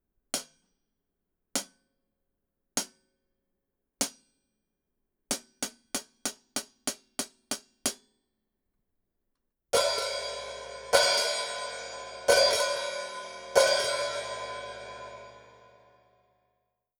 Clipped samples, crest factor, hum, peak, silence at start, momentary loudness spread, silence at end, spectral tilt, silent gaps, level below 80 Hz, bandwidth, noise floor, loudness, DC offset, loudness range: under 0.1%; 28 dB; none; -6 dBFS; 0.35 s; 17 LU; 1.55 s; -0.5 dB/octave; none; -66 dBFS; over 20 kHz; -82 dBFS; -29 LUFS; under 0.1%; 12 LU